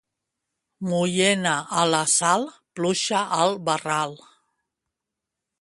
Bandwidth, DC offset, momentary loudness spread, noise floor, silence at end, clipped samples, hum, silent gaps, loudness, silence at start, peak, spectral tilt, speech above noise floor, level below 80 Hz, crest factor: 11.5 kHz; under 0.1%; 9 LU; -85 dBFS; 1.45 s; under 0.1%; none; none; -22 LUFS; 0.8 s; -4 dBFS; -3 dB/octave; 62 dB; -68 dBFS; 20 dB